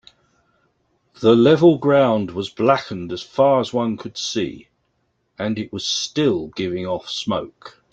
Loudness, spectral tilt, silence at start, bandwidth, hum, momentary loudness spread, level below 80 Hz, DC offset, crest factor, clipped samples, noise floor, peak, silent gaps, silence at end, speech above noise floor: -19 LUFS; -5.5 dB/octave; 1.2 s; 8.2 kHz; none; 13 LU; -58 dBFS; under 0.1%; 18 dB; under 0.1%; -68 dBFS; -2 dBFS; none; 0.25 s; 50 dB